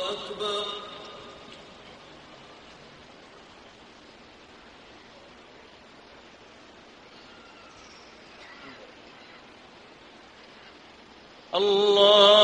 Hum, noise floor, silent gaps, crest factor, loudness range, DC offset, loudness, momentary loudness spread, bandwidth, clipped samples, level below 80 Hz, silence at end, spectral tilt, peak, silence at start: none; -51 dBFS; none; 26 dB; 19 LU; under 0.1%; -21 LUFS; 25 LU; 10 kHz; under 0.1%; -66 dBFS; 0 s; -3 dB/octave; -4 dBFS; 0 s